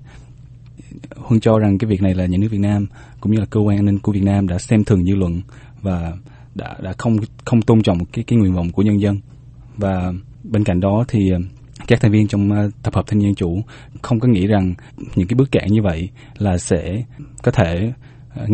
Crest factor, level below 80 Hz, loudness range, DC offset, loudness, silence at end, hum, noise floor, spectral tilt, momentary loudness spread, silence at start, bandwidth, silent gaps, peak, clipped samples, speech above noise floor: 18 dB; -38 dBFS; 2 LU; under 0.1%; -18 LUFS; 0 s; none; -40 dBFS; -8 dB/octave; 16 LU; 0 s; 8.8 kHz; none; 0 dBFS; under 0.1%; 23 dB